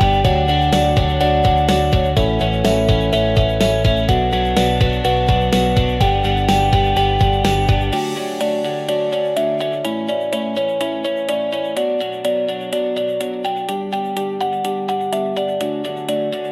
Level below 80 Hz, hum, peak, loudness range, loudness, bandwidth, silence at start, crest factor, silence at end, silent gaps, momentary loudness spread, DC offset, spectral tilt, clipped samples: -26 dBFS; none; -4 dBFS; 6 LU; -18 LUFS; 14 kHz; 0 s; 12 dB; 0 s; none; 6 LU; under 0.1%; -6 dB/octave; under 0.1%